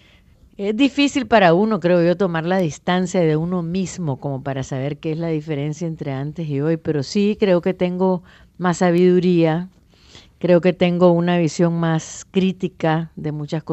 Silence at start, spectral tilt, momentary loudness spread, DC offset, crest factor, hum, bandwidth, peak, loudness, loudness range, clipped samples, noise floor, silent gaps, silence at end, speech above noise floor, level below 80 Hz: 0.6 s; -6.5 dB/octave; 11 LU; under 0.1%; 18 dB; none; 8.4 kHz; -2 dBFS; -19 LUFS; 6 LU; under 0.1%; -51 dBFS; none; 0 s; 32 dB; -54 dBFS